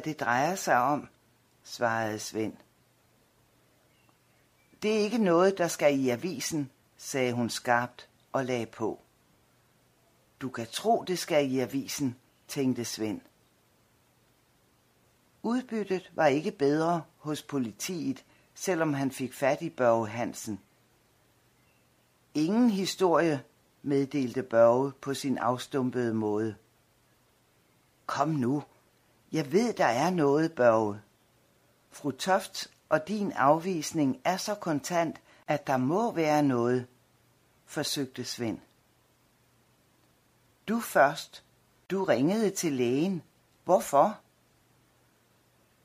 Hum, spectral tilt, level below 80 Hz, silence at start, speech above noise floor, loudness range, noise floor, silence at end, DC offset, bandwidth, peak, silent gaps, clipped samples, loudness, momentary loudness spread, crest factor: none; -5 dB/octave; -72 dBFS; 0 s; 39 dB; 8 LU; -67 dBFS; 1.65 s; under 0.1%; 15.5 kHz; -8 dBFS; none; under 0.1%; -29 LUFS; 13 LU; 22 dB